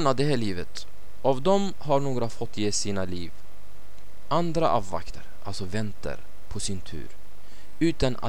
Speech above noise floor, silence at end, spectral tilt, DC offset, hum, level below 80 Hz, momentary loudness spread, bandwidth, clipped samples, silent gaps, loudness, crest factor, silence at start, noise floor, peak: 24 dB; 0 s; -5 dB/octave; 6%; none; -46 dBFS; 17 LU; 18 kHz; under 0.1%; none; -28 LUFS; 20 dB; 0 s; -51 dBFS; -8 dBFS